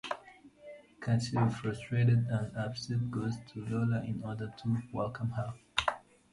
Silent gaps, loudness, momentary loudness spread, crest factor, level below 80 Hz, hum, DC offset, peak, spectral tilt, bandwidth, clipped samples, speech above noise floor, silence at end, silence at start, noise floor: none; -34 LUFS; 13 LU; 22 dB; -60 dBFS; none; under 0.1%; -12 dBFS; -6.5 dB/octave; 11.5 kHz; under 0.1%; 24 dB; 0.35 s; 0.05 s; -56 dBFS